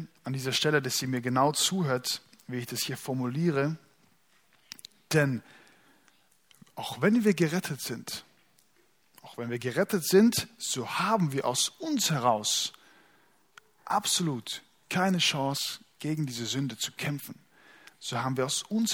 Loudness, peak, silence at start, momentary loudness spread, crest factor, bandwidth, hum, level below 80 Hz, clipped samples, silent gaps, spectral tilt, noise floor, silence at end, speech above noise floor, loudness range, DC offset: -29 LUFS; -10 dBFS; 0 s; 14 LU; 22 dB; 19 kHz; none; -72 dBFS; under 0.1%; none; -4 dB/octave; -68 dBFS; 0 s; 40 dB; 6 LU; under 0.1%